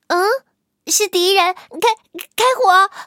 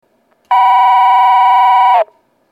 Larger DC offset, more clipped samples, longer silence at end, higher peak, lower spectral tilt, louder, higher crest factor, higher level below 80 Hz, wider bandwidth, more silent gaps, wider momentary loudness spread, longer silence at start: neither; neither; second, 0 s vs 0.5 s; about the same, 0 dBFS vs 0 dBFS; about the same, 0.5 dB/octave vs 1 dB/octave; second, -15 LUFS vs -9 LUFS; first, 16 dB vs 10 dB; first, -74 dBFS vs -80 dBFS; first, 17.5 kHz vs 14.5 kHz; neither; first, 13 LU vs 6 LU; second, 0.1 s vs 0.5 s